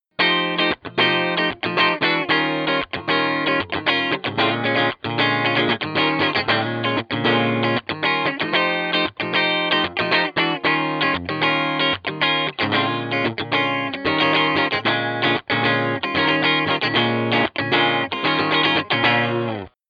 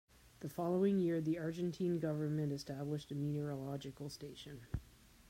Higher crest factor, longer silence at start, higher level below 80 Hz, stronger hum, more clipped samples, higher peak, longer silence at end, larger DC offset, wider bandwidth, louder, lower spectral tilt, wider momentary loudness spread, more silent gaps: about the same, 16 dB vs 16 dB; about the same, 0.2 s vs 0.25 s; about the same, -60 dBFS vs -62 dBFS; neither; neither; first, -4 dBFS vs -24 dBFS; second, 0.2 s vs 0.45 s; neither; second, 6.8 kHz vs 16 kHz; first, -19 LUFS vs -40 LUFS; about the same, -6.5 dB/octave vs -7.5 dB/octave; second, 4 LU vs 14 LU; neither